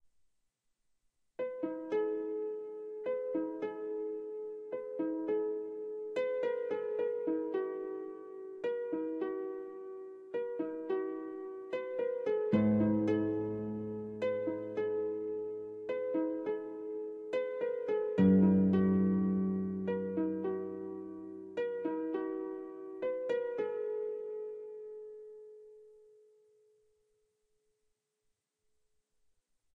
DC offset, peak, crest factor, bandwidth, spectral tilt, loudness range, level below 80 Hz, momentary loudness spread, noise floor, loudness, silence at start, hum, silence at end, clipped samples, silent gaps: under 0.1%; -16 dBFS; 20 dB; 4.5 kHz; -10 dB/octave; 9 LU; -72 dBFS; 15 LU; -83 dBFS; -35 LUFS; 1.4 s; none; 3.8 s; under 0.1%; none